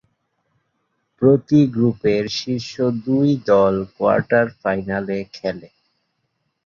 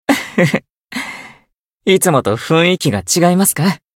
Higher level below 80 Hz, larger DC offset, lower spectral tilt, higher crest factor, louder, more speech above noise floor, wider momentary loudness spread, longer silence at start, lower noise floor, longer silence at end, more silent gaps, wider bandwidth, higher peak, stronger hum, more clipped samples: about the same, -54 dBFS vs -52 dBFS; neither; first, -7 dB/octave vs -4.5 dB/octave; about the same, 18 dB vs 16 dB; second, -19 LUFS vs -14 LUFS; first, 54 dB vs 44 dB; about the same, 11 LU vs 13 LU; first, 1.2 s vs 0.1 s; first, -72 dBFS vs -58 dBFS; first, 1 s vs 0.2 s; second, none vs 0.77-0.85 s, 1.58-1.78 s; second, 7.2 kHz vs 17 kHz; about the same, -2 dBFS vs 0 dBFS; neither; neither